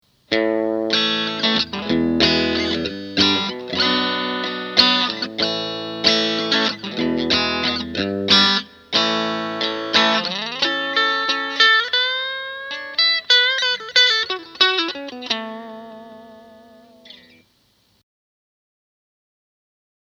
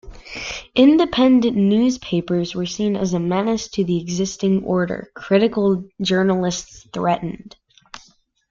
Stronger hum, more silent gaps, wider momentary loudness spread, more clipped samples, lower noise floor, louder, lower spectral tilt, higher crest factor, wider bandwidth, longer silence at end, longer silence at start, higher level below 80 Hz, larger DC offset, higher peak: neither; neither; second, 11 LU vs 14 LU; neither; first, -61 dBFS vs -55 dBFS; about the same, -18 LUFS vs -19 LUFS; second, -3 dB/octave vs -5.5 dB/octave; about the same, 20 dB vs 16 dB; first, 10 kHz vs 7.6 kHz; first, 2.9 s vs 0.55 s; first, 0.3 s vs 0.05 s; about the same, -52 dBFS vs -48 dBFS; neither; about the same, 0 dBFS vs -2 dBFS